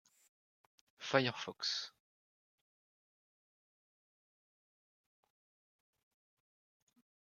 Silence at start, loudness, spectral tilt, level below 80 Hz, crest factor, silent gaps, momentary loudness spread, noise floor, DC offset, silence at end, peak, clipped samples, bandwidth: 1 s; -37 LUFS; -3.5 dB/octave; under -90 dBFS; 32 dB; none; 14 LU; under -90 dBFS; under 0.1%; 5.45 s; -14 dBFS; under 0.1%; 13.5 kHz